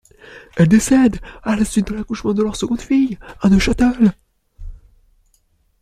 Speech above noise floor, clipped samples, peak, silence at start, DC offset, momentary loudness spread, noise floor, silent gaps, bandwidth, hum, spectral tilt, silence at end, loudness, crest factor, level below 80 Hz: 45 dB; under 0.1%; -2 dBFS; 0.3 s; under 0.1%; 9 LU; -60 dBFS; none; 14 kHz; none; -6 dB/octave; 1.05 s; -17 LUFS; 16 dB; -34 dBFS